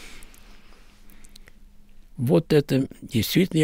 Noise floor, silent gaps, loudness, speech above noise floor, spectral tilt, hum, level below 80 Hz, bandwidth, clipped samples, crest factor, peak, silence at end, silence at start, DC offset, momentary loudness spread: -47 dBFS; none; -23 LUFS; 26 dB; -6 dB/octave; none; -48 dBFS; 16.5 kHz; under 0.1%; 18 dB; -8 dBFS; 0 s; 0 s; under 0.1%; 17 LU